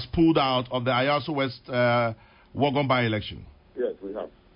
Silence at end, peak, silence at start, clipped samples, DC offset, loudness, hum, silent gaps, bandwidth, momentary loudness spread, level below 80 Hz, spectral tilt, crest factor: 0.25 s; -10 dBFS; 0 s; under 0.1%; under 0.1%; -25 LUFS; none; none; 5.4 kHz; 16 LU; -50 dBFS; -10.5 dB/octave; 16 dB